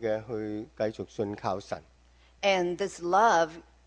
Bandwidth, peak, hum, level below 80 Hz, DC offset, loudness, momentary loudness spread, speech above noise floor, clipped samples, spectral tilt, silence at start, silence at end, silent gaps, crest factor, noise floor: 10 kHz; -10 dBFS; none; -60 dBFS; under 0.1%; -29 LUFS; 13 LU; 31 dB; under 0.1%; -4.5 dB/octave; 0 s; 0.25 s; none; 18 dB; -60 dBFS